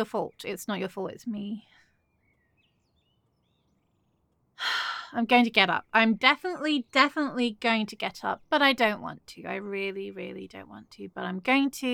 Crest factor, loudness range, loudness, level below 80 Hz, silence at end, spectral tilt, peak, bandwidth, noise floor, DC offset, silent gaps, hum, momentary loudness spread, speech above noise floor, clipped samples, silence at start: 24 dB; 15 LU; -26 LUFS; -72 dBFS; 0 s; -4 dB/octave; -4 dBFS; 17.5 kHz; -71 dBFS; under 0.1%; none; none; 18 LU; 44 dB; under 0.1%; 0 s